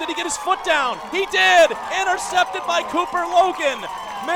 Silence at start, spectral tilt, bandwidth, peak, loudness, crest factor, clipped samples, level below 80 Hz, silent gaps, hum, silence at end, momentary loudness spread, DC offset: 0 s; -1 dB/octave; 17.5 kHz; -4 dBFS; -19 LUFS; 16 dB; under 0.1%; -54 dBFS; none; none; 0 s; 9 LU; under 0.1%